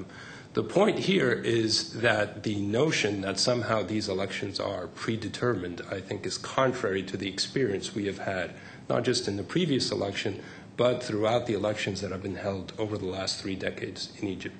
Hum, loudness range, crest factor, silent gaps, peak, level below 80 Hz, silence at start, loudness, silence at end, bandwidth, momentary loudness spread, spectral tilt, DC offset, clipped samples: none; 4 LU; 20 dB; none; -8 dBFS; -62 dBFS; 0 s; -29 LUFS; 0 s; 9.2 kHz; 9 LU; -4.5 dB/octave; under 0.1%; under 0.1%